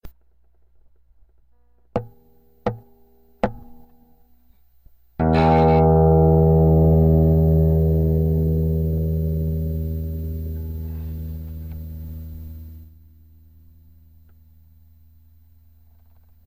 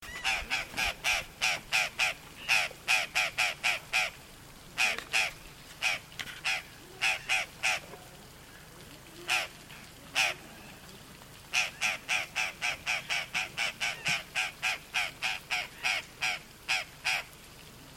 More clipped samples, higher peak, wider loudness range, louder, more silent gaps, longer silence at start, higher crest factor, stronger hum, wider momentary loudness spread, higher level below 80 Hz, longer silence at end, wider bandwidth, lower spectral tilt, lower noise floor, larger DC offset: neither; first, -4 dBFS vs -12 dBFS; first, 19 LU vs 5 LU; first, -19 LUFS vs -30 LUFS; neither; about the same, 0.05 s vs 0 s; second, 16 dB vs 22 dB; neither; about the same, 20 LU vs 21 LU; first, -30 dBFS vs -58 dBFS; first, 3.6 s vs 0 s; about the same, 15.5 kHz vs 16.5 kHz; first, -11 dB/octave vs 0 dB/octave; first, -61 dBFS vs -51 dBFS; first, 0.2% vs under 0.1%